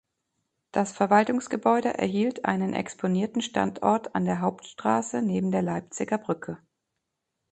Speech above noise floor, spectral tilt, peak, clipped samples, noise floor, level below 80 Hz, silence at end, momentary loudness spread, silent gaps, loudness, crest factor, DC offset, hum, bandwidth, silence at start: 56 dB; -6 dB/octave; -6 dBFS; under 0.1%; -82 dBFS; -66 dBFS; 0.95 s; 9 LU; none; -26 LUFS; 22 dB; under 0.1%; none; 9 kHz; 0.75 s